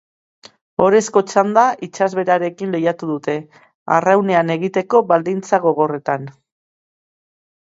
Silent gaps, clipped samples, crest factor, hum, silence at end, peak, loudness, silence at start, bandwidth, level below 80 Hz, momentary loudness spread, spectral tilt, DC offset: 3.75-3.86 s; under 0.1%; 18 dB; none; 1.45 s; 0 dBFS; -17 LUFS; 0.8 s; 8 kHz; -62 dBFS; 9 LU; -5.5 dB/octave; under 0.1%